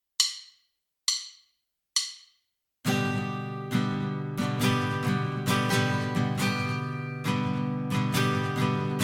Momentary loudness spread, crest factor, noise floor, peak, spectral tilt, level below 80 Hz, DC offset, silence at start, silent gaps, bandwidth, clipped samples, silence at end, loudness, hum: 7 LU; 22 dB; -76 dBFS; -8 dBFS; -4.5 dB/octave; -60 dBFS; under 0.1%; 0.2 s; none; 17 kHz; under 0.1%; 0 s; -28 LUFS; none